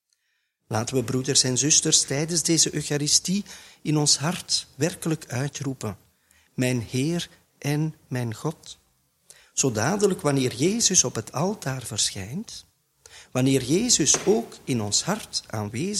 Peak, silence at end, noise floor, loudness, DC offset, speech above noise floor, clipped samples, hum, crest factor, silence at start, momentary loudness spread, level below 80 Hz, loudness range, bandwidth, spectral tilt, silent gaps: -4 dBFS; 0 s; -74 dBFS; -23 LUFS; under 0.1%; 50 dB; under 0.1%; none; 22 dB; 0.7 s; 14 LU; -58 dBFS; 8 LU; 16 kHz; -3 dB/octave; none